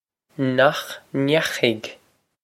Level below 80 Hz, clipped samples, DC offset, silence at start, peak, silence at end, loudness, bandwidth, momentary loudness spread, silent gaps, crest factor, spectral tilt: -66 dBFS; under 0.1%; under 0.1%; 0.4 s; -2 dBFS; 0.5 s; -21 LUFS; 16.5 kHz; 14 LU; none; 22 dB; -5 dB/octave